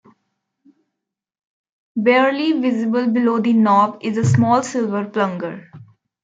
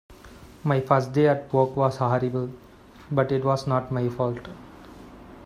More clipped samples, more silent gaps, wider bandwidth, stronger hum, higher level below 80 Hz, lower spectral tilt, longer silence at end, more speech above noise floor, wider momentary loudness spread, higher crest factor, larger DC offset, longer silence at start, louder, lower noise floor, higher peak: neither; neither; second, 9 kHz vs 11.5 kHz; neither; second, -64 dBFS vs -54 dBFS; second, -6.5 dB/octave vs -8 dB/octave; first, 0.4 s vs 0 s; first, 65 dB vs 23 dB; second, 8 LU vs 23 LU; second, 16 dB vs 22 dB; neither; first, 1.95 s vs 0.1 s; first, -17 LUFS vs -24 LUFS; first, -82 dBFS vs -47 dBFS; about the same, -4 dBFS vs -4 dBFS